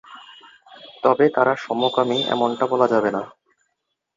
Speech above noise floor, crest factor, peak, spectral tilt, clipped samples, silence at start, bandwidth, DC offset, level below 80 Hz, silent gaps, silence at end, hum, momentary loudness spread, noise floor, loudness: 57 dB; 20 dB; -2 dBFS; -5.5 dB/octave; under 0.1%; 0.1 s; 7.6 kHz; under 0.1%; -70 dBFS; none; 0.9 s; none; 9 LU; -76 dBFS; -20 LUFS